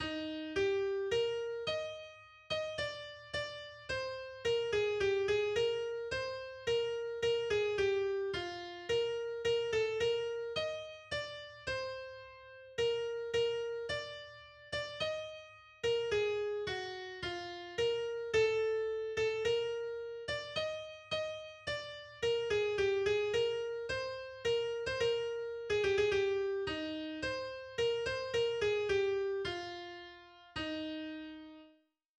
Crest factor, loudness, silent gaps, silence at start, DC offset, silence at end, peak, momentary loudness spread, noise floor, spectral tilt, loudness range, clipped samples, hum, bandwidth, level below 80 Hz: 16 dB; -36 LUFS; none; 0 s; under 0.1%; 0.5 s; -20 dBFS; 12 LU; -69 dBFS; -4 dB/octave; 4 LU; under 0.1%; none; 9.8 kHz; -64 dBFS